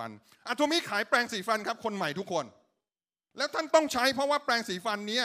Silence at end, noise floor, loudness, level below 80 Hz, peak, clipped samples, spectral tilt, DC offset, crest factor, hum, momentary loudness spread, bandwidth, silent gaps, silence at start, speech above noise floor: 0 s; under -90 dBFS; -29 LUFS; -74 dBFS; -10 dBFS; under 0.1%; -3 dB/octave; under 0.1%; 22 dB; none; 9 LU; 15.5 kHz; none; 0 s; over 60 dB